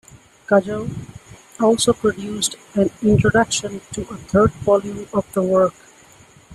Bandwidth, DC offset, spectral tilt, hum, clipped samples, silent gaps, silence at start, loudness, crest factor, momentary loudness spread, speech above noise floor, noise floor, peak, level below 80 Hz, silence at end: 13 kHz; under 0.1%; -5 dB/octave; none; under 0.1%; none; 0.15 s; -19 LUFS; 16 dB; 13 LU; 30 dB; -48 dBFS; -4 dBFS; -44 dBFS; 0 s